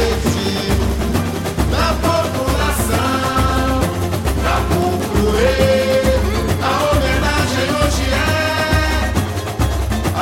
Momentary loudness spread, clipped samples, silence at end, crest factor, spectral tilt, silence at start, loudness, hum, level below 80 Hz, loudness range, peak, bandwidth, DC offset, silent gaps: 4 LU; under 0.1%; 0 s; 14 dB; -5 dB/octave; 0 s; -17 LUFS; none; -22 dBFS; 2 LU; -2 dBFS; 16.5 kHz; under 0.1%; none